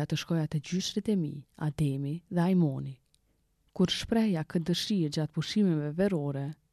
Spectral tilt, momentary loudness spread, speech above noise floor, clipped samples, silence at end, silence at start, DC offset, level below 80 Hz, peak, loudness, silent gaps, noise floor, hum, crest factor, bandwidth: -6 dB/octave; 9 LU; 42 dB; under 0.1%; 0.2 s; 0 s; under 0.1%; -58 dBFS; -14 dBFS; -30 LUFS; none; -72 dBFS; none; 16 dB; 13.5 kHz